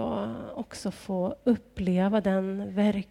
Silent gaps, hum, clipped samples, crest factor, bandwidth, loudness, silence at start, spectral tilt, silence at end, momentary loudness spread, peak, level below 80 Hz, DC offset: none; none; under 0.1%; 16 dB; 12 kHz; -29 LUFS; 0 s; -7.5 dB/octave; 0.05 s; 11 LU; -12 dBFS; -54 dBFS; under 0.1%